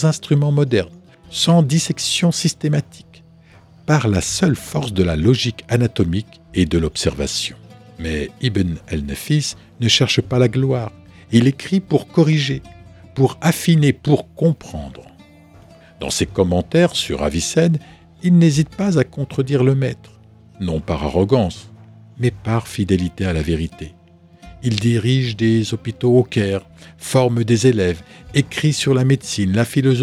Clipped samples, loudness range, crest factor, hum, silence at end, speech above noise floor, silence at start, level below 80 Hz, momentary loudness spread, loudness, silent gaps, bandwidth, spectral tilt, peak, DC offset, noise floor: under 0.1%; 4 LU; 18 dB; none; 0 s; 29 dB; 0 s; -38 dBFS; 10 LU; -18 LUFS; none; 15 kHz; -5.5 dB/octave; 0 dBFS; under 0.1%; -47 dBFS